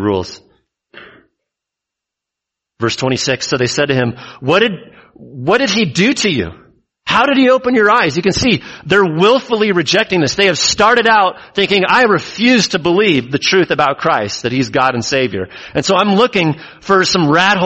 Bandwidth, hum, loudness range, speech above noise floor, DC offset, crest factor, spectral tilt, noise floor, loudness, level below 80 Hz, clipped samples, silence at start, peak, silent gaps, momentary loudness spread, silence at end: 8.4 kHz; none; 7 LU; 69 dB; under 0.1%; 14 dB; -4 dB/octave; -82 dBFS; -13 LUFS; -46 dBFS; under 0.1%; 0 s; 0 dBFS; none; 8 LU; 0 s